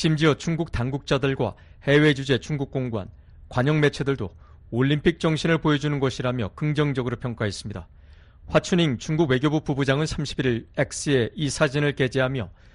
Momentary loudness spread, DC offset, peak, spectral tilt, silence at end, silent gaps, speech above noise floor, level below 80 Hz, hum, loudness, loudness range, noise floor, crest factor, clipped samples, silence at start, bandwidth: 9 LU; under 0.1%; -6 dBFS; -6 dB/octave; 0.25 s; none; 25 dB; -44 dBFS; none; -24 LUFS; 2 LU; -48 dBFS; 18 dB; under 0.1%; 0 s; 11 kHz